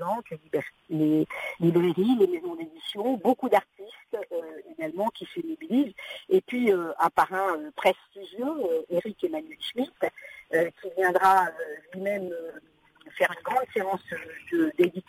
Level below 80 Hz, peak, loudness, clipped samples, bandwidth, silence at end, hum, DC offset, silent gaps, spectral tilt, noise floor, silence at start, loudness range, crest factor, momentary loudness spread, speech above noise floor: -72 dBFS; -10 dBFS; -27 LUFS; under 0.1%; 16 kHz; 0.1 s; none; under 0.1%; none; -6 dB/octave; -54 dBFS; 0 s; 4 LU; 18 dB; 13 LU; 28 dB